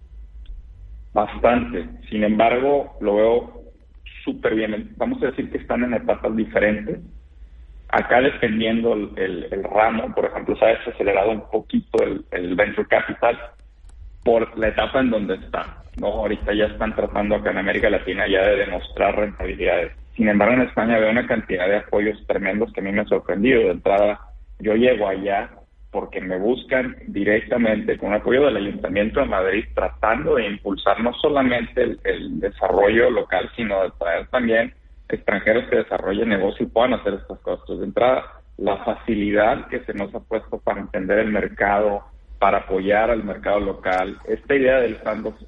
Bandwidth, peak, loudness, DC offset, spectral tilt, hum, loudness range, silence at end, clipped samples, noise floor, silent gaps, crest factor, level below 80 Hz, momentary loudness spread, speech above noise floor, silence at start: 5.4 kHz; -2 dBFS; -21 LUFS; under 0.1%; -8 dB/octave; none; 3 LU; 0 s; under 0.1%; -43 dBFS; none; 18 dB; -40 dBFS; 9 LU; 23 dB; 0 s